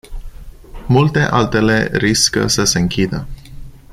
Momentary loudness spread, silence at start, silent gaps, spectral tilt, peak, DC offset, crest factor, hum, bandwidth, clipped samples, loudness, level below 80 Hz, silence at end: 9 LU; 0.1 s; none; -4 dB/octave; 0 dBFS; under 0.1%; 16 dB; none; 15 kHz; under 0.1%; -14 LUFS; -32 dBFS; 0.15 s